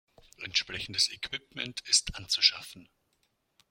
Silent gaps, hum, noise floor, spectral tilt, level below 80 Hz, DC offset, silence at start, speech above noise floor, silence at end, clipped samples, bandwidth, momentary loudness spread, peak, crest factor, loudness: none; none; -75 dBFS; 0.5 dB/octave; -56 dBFS; under 0.1%; 0.4 s; 44 dB; 0.85 s; under 0.1%; 16.5 kHz; 16 LU; -8 dBFS; 26 dB; -28 LUFS